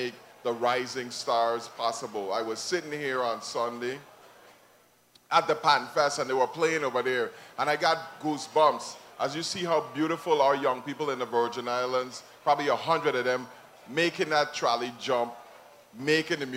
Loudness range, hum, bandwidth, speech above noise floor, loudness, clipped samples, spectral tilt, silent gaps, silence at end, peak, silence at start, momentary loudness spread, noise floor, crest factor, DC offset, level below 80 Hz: 4 LU; none; 16 kHz; 33 dB; -28 LUFS; under 0.1%; -3.5 dB/octave; none; 0 s; -8 dBFS; 0 s; 10 LU; -61 dBFS; 20 dB; under 0.1%; -76 dBFS